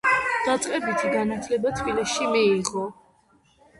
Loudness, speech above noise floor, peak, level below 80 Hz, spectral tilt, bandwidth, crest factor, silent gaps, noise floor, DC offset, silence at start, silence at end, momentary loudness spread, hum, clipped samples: -24 LUFS; 37 dB; -8 dBFS; -54 dBFS; -3.5 dB/octave; 11.5 kHz; 16 dB; none; -61 dBFS; under 0.1%; 0.05 s; 0.85 s; 6 LU; none; under 0.1%